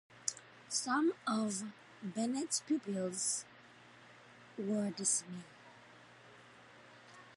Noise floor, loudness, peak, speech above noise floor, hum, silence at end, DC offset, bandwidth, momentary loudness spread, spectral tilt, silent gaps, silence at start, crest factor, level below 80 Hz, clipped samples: -60 dBFS; -37 LUFS; -14 dBFS; 23 dB; none; 0 s; under 0.1%; 11.5 kHz; 24 LU; -3 dB/octave; none; 0.1 s; 26 dB; -86 dBFS; under 0.1%